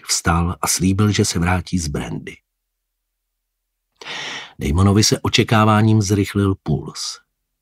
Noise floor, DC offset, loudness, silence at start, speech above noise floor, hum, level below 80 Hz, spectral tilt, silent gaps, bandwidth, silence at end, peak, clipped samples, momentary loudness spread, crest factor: -76 dBFS; under 0.1%; -18 LUFS; 0.05 s; 59 dB; none; -36 dBFS; -4.5 dB/octave; none; 16 kHz; 0.45 s; -2 dBFS; under 0.1%; 15 LU; 18 dB